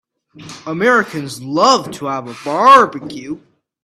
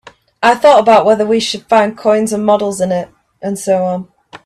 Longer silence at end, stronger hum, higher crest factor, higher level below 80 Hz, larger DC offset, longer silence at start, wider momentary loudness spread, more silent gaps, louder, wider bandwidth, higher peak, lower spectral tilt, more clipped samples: first, 0.45 s vs 0.1 s; neither; about the same, 16 dB vs 12 dB; second, -60 dBFS vs -54 dBFS; neither; about the same, 0.4 s vs 0.4 s; first, 21 LU vs 13 LU; neither; about the same, -13 LUFS vs -12 LUFS; about the same, 14 kHz vs 13.5 kHz; about the same, 0 dBFS vs 0 dBFS; about the same, -4 dB/octave vs -4.5 dB/octave; neither